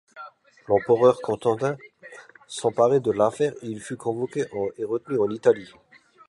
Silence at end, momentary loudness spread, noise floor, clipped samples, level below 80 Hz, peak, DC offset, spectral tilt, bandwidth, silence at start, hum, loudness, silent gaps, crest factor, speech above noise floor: 0.65 s; 22 LU; -47 dBFS; under 0.1%; -64 dBFS; -6 dBFS; under 0.1%; -6 dB/octave; 11.5 kHz; 0.15 s; none; -24 LUFS; none; 18 dB; 24 dB